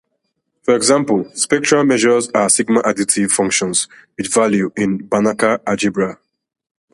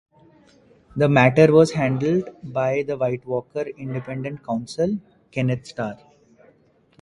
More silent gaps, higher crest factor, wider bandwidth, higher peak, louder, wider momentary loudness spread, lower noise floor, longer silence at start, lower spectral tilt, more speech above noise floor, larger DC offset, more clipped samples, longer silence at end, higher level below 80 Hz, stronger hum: neither; second, 16 dB vs 22 dB; about the same, 11.5 kHz vs 11.5 kHz; about the same, 0 dBFS vs 0 dBFS; first, -15 LUFS vs -21 LUFS; second, 6 LU vs 16 LU; first, -71 dBFS vs -58 dBFS; second, 0.65 s vs 0.95 s; second, -3.5 dB/octave vs -7 dB/octave; first, 55 dB vs 37 dB; neither; neither; second, 0.8 s vs 1.05 s; about the same, -56 dBFS vs -56 dBFS; neither